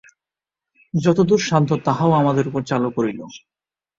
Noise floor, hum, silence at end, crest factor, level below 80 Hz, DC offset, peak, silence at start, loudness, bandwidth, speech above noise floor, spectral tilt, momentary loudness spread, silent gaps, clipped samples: -89 dBFS; none; 0.6 s; 18 dB; -58 dBFS; under 0.1%; -2 dBFS; 0.95 s; -19 LUFS; 7.8 kHz; 70 dB; -6.5 dB/octave; 9 LU; none; under 0.1%